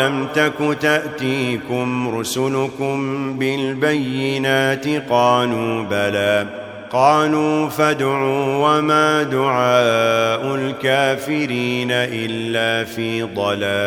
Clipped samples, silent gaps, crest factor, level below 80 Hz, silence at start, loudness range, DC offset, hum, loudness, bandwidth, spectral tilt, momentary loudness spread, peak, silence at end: under 0.1%; none; 16 dB; -60 dBFS; 0 s; 4 LU; under 0.1%; none; -18 LUFS; 17.5 kHz; -5 dB/octave; 7 LU; -2 dBFS; 0 s